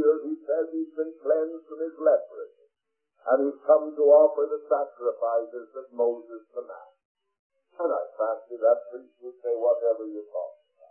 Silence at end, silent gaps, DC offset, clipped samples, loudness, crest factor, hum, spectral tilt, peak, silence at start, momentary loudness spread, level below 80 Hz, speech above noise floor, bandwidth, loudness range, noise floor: 0.4 s; 7.05-7.15 s, 7.39-7.50 s; under 0.1%; under 0.1%; -26 LUFS; 20 dB; none; -9.5 dB/octave; -8 dBFS; 0 s; 18 LU; under -90 dBFS; 57 dB; 1.9 kHz; 8 LU; -82 dBFS